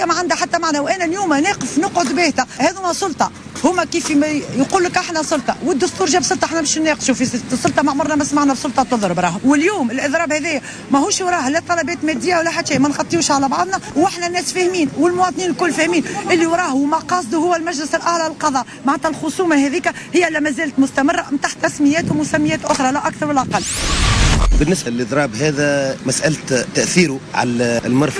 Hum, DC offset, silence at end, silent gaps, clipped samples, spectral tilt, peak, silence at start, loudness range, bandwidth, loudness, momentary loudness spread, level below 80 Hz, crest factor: none; under 0.1%; 0 s; none; under 0.1%; -4 dB/octave; -2 dBFS; 0 s; 1 LU; 11 kHz; -17 LUFS; 4 LU; -30 dBFS; 14 dB